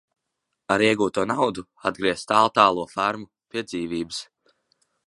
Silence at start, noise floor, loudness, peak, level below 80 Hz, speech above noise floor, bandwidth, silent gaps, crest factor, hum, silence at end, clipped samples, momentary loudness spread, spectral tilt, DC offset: 0.7 s; -80 dBFS; -23 LUFS; -2 dBFS; -60 dBFS; 57 dB; 11.5 kHz; none; 22 dB; none; 0.85 s; under 0.1%; 14 LU; -4.5 dB/octave; under 0.1%